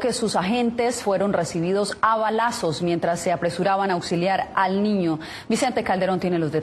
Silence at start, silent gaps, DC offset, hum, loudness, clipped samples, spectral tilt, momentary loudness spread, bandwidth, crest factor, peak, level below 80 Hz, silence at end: 0 s; none; under 0.1%; none; -22 LUFS; under 0.1%; -5 dB/octave; 3 LU; 12.5 kHz; 16 dB; -6 dBFS; -56 dBFS; 0 s